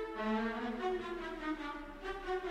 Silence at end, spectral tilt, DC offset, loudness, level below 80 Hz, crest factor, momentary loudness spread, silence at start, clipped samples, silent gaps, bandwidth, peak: 0 s; -5.5 dB/octave; under 0.1%; -39 LUFS; -56 dBFS; 14 dB; 8 LU; 0 s; under 0.1%; none; 12.5 kHz; -26 dBFS